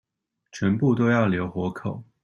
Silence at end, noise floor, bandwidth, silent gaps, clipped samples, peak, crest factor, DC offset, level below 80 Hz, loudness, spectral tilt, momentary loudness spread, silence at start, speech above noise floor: 0.2 s; -71 dBFS; 7.4 kHz; none; under 0.1%; -8 dBFS; 16 dB; under 0.1%; -58 dBFS; -24 LUFS; -8 dB/octave; 13 LU; 0.55 s; 47 dB